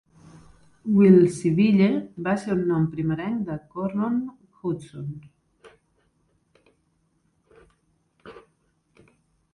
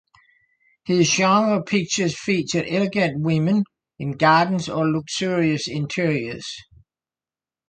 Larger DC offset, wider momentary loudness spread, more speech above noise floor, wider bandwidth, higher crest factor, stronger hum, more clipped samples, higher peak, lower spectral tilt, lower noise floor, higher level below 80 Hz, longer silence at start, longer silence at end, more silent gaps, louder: neither; first, 20 LU vs 14 LU; second, 47 dB vs over 70 dB; first, 11 kHz vs 9.4 kHz; about the same, 22 dB vs 18 dB; neither; neither; about the same, -4 dBFS vs -4 dBFS; first, -8 dB/octave vs -5 dB/octave; second, -69 dBFS vs under -90 dBFS; about the same, -60 dBFS vs -58 dBFS; about the same, 0.85 s vs 0.85 s; about the same, 1.15 s vs 1.05 s; neither; about the same, -22 LUFS vs -21 LUFS